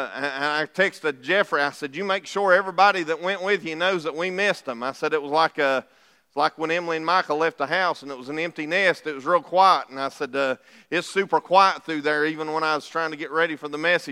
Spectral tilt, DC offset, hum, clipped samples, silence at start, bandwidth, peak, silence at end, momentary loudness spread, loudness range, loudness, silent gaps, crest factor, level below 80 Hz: -4 dB/octave; under 0.1%; none; under 0.1%; 0 s; 14 kHz; -2 dBFS; 0 s; 10 LU; 2 LU; -23 LUFS; none; 20 dB; -80 dBFS